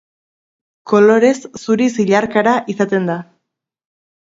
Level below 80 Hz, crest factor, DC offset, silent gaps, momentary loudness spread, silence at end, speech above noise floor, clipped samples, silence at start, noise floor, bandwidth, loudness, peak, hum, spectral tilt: -60 dBFS; 16 dB; under 0.1%; none; 10 LU; 1 s; 63 dB; under 0.1%; 0.85 s; -76 dBFS; 7.8 kHz; -14 LUFS; 0 dBFS; none; -6 dB/octave